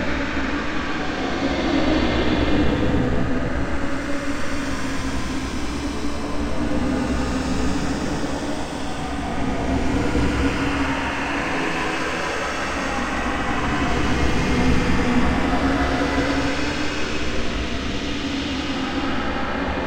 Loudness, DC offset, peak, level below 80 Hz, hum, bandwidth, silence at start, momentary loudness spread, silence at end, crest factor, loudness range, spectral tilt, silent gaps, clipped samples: -23 LUFS; under 0.1%; -6 dBFS; -30 dBFS; none; 15 kHz; 0 s; 6 LU; 0 s; 16 dB; 4 LU; -5.5 dB/octave; none; under 0.1%